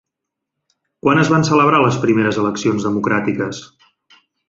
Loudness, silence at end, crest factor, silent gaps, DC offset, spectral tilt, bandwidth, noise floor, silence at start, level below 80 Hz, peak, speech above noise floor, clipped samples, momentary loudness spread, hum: -16 LUFS; 0.85 s; 16 dB; none; under 0.1%; -6 dB/octave; 7.8 kHz; -80 dBFS; 1.05 s; -54 dBFS; -2 dBFS; 65 dB; under 0.1%; 9 LU; none